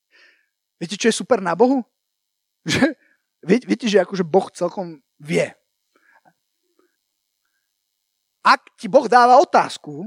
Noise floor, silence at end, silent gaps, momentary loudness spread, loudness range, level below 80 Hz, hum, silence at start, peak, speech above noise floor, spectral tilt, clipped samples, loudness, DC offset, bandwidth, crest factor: -77 dBFS; 0 s; none; 15 LU; 12 LU; -64 dBFS; none; 0.8 s; 0 dBFS; 59 dB; -4.5 dB/octave; under 0.1%; -18 LUFS; under 0.1%; 13 kHz; 20 dB